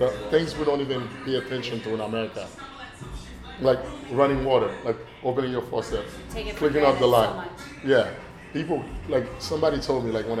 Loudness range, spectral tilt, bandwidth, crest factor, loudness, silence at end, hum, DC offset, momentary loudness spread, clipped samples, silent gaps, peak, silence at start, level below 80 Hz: 5 LU; -6 dB/octave; 14.5 kHz; 20 dB; -25 LUFS; 0 s; none; under 0.1%; 17 LU; under 0.1%; none; -4 dBFS; 0 s; -44 dBFS